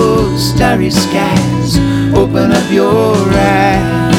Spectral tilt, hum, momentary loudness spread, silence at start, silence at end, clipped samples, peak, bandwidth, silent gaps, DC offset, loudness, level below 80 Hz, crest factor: -6 dB/octave; none; 3 LU; 0 s; 0 s; under 0.1%; 0 dBFS; 17.5 kHz; none; under 0.1%; -11 LUFS; -26 dBFS; 10 dB